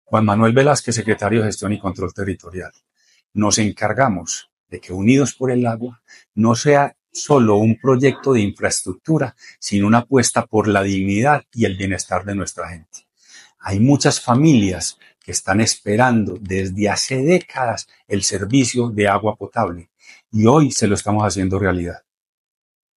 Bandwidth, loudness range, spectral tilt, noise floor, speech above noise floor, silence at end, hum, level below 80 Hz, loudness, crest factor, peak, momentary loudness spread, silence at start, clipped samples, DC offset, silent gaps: 12 kHz; 3 LU; -5 dB/octave; -47 dBFS; 30 dB; 1 s; none; -52 dBFS; -17 LUFS; 18 dB; 0 dBFS; 13 LU; 0.1 s; under 0.1%; under 0.1%; 3.25-3.30 s, 4.52-4.66 s, 6.28-6.32 s